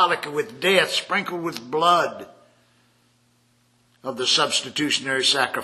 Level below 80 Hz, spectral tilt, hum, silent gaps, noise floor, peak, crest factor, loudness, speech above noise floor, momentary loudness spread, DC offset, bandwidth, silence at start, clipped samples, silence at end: -72 dBFS; -2 dB/octave; none; none; -62 dBFS; -2 dBFS; 22 dB; -21 LUFS; 40 dB; 11 LU; under 0.1%; 13.5 kHz; 0 s; under 0.1%; 0 s